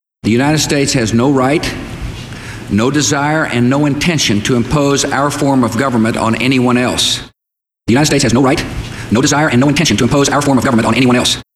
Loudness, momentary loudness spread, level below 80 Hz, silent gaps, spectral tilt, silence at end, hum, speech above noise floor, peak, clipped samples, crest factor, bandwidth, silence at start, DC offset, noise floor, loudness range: -12 LUFS; 9 LU; -34 dBFS; none; -4.5 dB/octave; 0.15 s; none; 69 dB; 0 dBFS; under 0.1%; 12 dB; 15 kHz; 0.25 s; under 0.1%; -81 dBFS; 2 LU